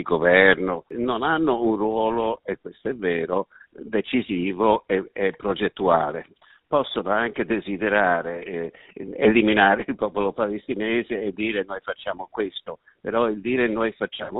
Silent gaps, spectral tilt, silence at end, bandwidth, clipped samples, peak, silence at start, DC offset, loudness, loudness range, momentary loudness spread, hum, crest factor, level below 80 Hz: none; -3 dB/octave; 0 s; 4.1 kHz; under 0.1%; 0 dBFS; 0 s; under 0.1%; -23 LUFS; 5 LU; 13 LU; none; 22 dB; -54 dBFS